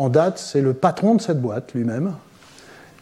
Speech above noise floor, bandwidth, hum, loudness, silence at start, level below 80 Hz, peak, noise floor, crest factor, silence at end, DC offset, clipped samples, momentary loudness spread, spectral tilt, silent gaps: 27 dB; 12.5 kHz; none; -21 LUFS; 0 s; -66 dBFS; -4 dBFS; -46 dBFS; 16 dB; 0.8 s; under 0.1%; under 0.1%; 8 LU; -7 dB/octave; none